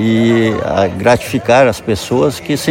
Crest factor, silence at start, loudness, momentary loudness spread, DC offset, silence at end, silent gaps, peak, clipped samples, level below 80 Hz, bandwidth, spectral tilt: 12 dB; 0 s; -13 LUFS; 5 LU; under 0.1%; 0 s; none; 0 dBFS; under 0.1%; -40 dBFS; 17 kHz; -5.5 dB/octave